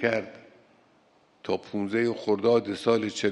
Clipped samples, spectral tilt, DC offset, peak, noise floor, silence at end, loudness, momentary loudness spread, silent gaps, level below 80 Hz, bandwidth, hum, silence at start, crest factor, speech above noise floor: under 0.1%; -5.5 dB/octave; under 0.1%; -8 dBFS; -62 dBFS; 0 s; -27 LUFS; 9 LU; none; -72 dBFS; 11.5 kHz; none; 0 s; 18 dB; 36 dB